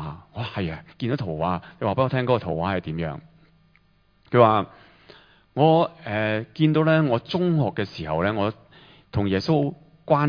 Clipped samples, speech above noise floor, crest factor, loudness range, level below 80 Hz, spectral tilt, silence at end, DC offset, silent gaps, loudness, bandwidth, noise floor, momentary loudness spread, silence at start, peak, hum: under 0.1%; 39 dB; 22 dB; 5 LU; -52 dBFS; -8.5 dB/octave; 0 s; under 0.1%; none; -23 LUFS; 5.2 kHz; -61 dBFS; 13 LU; 0 s; -2 dBFS; none